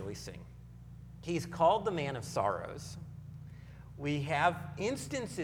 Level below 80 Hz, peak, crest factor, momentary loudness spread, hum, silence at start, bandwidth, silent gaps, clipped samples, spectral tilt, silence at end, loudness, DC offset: -58 dBFS; -14 dBFS; 22 dB; 22 LU; none; 0 s; 17.5 kHz; none; under 0.1%; -5.5 dB/octave; 0 s; -34 LUFS; under 0.1%